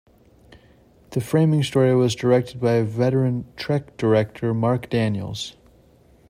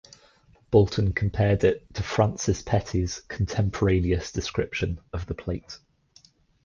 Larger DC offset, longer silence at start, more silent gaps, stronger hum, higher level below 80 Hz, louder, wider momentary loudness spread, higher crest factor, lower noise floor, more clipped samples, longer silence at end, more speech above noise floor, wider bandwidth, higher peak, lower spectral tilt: neither; first, 1.1 s vs 0.7 s; neither; neither; second, -56 dBFS vs -38 dBFS; first, -21 LUFS vs -26 LUFS; about the same, 10 LU vs 12 LU; about the same, 18 dB vs 20 dB; second, -54 dBFS vs -58 dBFS; neither; about the same, 0.8 s vs 0.9 s; about the same, 33 dB vs 34 dB; first, 15.5 kHz vs 7.4 kHz; about the same, -4 dBFS vs -6 dBFS; about the same, -7 dB/octave vs -6 dB/octave